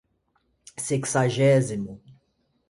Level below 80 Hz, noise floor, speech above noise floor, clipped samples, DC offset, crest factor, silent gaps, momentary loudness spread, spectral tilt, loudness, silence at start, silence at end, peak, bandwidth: -60 dBFS; -70 dBFS; 47 dB; under 0.1%; under 0.1%; 18 dB; none; 16 LU; -5.5 dB/octave; -23 LUFS; 0.8 s; 0.6 s; -8 dBFS; 11.5 kHz